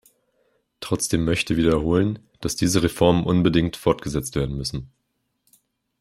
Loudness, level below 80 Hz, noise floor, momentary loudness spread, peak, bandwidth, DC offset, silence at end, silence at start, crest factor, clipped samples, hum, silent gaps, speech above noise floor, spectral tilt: -22 LUFS; -42 dBFS; -74 dBFS; 10 LU; -2 dBFS; 15 kHz; under 0.1%; 1.15 s; 0.8 s; 20 dB; under 0.1%; none; none; 53 dB; -5.5 dB/octave